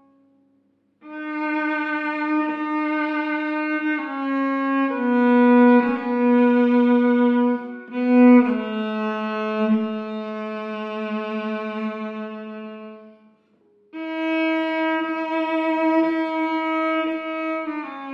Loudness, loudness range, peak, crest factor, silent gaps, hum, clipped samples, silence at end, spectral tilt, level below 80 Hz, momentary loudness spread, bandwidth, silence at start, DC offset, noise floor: -21 LUFS; 11 LU; -4 dBFS; 16 dB; none; none; under 0.1%; 0 s; -7.5 dB/octave; -74 dBFS; 15 LU; 5.4 kHz; 1.05 s; under 0.1%; -64 dBFS